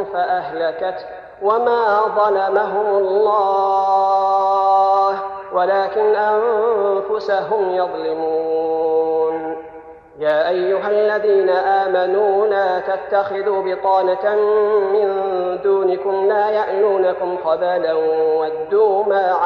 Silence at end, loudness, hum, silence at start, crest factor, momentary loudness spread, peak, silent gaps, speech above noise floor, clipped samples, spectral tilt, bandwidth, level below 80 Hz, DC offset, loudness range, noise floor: 0 s; -17 LUFS; none; 0 s; 14 dB; 6 LU; -4 dBFS; none; 22 dB; under 0.1%; -6.5 dB/octave; 6.2 kHz; -60 dBFS; under 0.1%; 3 LU; -38 dBFS